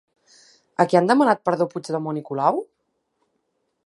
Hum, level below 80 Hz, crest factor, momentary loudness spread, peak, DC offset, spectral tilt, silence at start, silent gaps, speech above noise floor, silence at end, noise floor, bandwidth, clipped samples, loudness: none; -76 dBFS; 22 dB; 11 LU; -2 dBFS; under 0.1%; -6.5 dB/octave; 0.8 s; none; 53 dB; 1.25 s; -73 dBFS; 11.5 kHz; under 0.1%; -21 LUFS